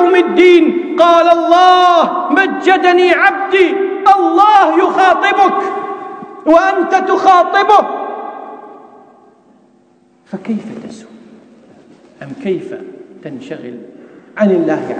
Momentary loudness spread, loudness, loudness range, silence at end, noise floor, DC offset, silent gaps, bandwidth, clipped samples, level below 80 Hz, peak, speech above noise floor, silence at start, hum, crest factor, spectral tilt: 21 LU; -10 LUFS; 19 LU; 0 s; -50 dBFS; under 0.1%; none; 9.2 kHz; 0.6%; -58 dBFS; 0 dBFS; 40 dB; 0 s; none; 12 dB; -5 dB/octave